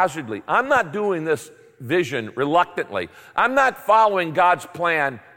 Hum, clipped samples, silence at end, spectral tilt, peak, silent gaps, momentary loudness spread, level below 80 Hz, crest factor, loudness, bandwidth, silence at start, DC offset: none; under 0.1%; 0.15 s; -5 dB/octave; -6 dBFS; none; 10 LU; -62 dBFS; 16 dB; -20 LUFS; 17 kHz; 0 s; under 0.1%